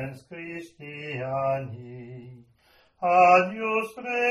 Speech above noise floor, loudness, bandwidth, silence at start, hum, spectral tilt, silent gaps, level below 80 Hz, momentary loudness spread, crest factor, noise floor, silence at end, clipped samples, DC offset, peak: 36 dB; -23 LUFS; 12.5 kHz; 0 s; none; -6 dB/octave; none; -66 dBFS; 23 LU; 20 dB; -61 dBFS; 0 s; under 0.1%; under 0.1%; -6 dBFS